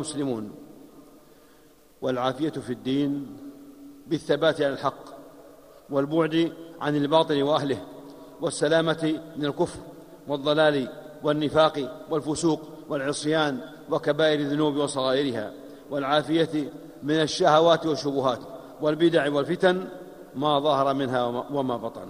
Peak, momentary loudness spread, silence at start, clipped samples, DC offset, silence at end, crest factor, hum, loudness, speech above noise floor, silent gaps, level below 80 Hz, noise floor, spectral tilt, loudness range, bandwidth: -4 dBFS; 15 LU; 0 s; under 0.1%; under 0.1%; 0 s; 20 dB; none; -25 LUFS; 30 dB; none; -62 dBFS; -55 dBFS; -5 dB/octave; 5 LU; 15.5 kHz